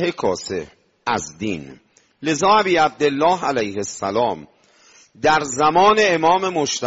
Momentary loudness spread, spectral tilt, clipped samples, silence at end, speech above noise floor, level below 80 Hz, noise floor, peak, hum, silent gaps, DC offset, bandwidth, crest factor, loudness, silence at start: 13 LU; -2.5 dB/octave; under 0.1%; 0 s; 33 dB; -54 dBFS; -52 dBFS; -4 dBFS; none; none; under 0.1%; 8 kHz; 16 dB; -18 LUFS; 0 s